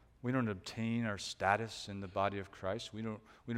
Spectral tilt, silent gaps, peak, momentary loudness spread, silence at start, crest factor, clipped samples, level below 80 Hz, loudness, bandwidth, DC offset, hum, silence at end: -5.5 dB/octave; none; -14 dBFS; 10 LU; 0.25 s; 24 dB; under 0.1%; -68 dBFS; -38 LUFS; 14.5 kHz; under 0.1%; none; 0 s